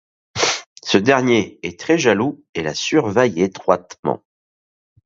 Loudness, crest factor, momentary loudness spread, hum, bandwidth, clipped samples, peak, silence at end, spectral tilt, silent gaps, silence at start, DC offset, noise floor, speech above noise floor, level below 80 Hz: -18 LUFS; 20 dB; 11 LU; none; 7.8 kHz; under 0.1%; 0 dBFS; 0.9 s; -4 dB/octave; 0.66-0.76 s, 2.49-2.53 s, 3.99-4.03 s; 0.35 s; under 0.1%; under -90 dBFS; over 72 dB; -54 dBFS